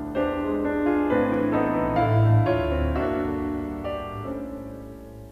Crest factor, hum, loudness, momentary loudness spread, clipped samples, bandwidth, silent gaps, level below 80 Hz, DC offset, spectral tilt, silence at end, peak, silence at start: 16 dB; none; -24 LUFS; 15 LU; under 0.1%; 5 kHz; none; -38 dBFS; under 0.1%; -9.5 dB/octave; 0 s; -8 dBFS; 0 s